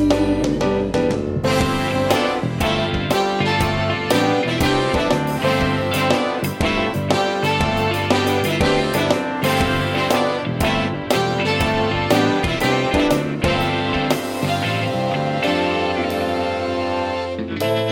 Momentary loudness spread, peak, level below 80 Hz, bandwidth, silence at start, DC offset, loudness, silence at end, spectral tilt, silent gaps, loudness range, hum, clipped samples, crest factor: 4 LU; -2 dBFS; -36 dBFS; 17 kHz; 0 s; under 0.1%; -19 LUFS; 0 s; -5 dB/octave; none; 2 LU; none; under 0.1%; 18 dB